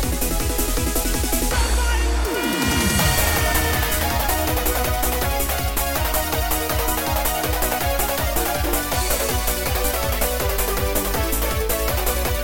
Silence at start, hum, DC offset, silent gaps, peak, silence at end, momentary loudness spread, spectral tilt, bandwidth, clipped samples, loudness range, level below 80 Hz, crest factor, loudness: 0 s; none; under 0.1%; none; -6 dBFS; 0 s; 3 LU; -3.5 dB/octave; 17 kHz; under 0.1%; 2 LU; -24 dBFS; 14 dB; -21 LUFS